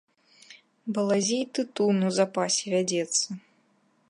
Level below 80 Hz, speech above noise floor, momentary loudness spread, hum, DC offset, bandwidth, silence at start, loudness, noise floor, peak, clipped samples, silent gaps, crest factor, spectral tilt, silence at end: -80 dBFS; 41 dB; 9 LU; none; under 0.1%; 11.5 kHz; 0.5 s; -26 LUFS; -67 dBFS; -10 dBFS; under 0.1%; none; 18 dB; -4 dB/octave; 0.7 s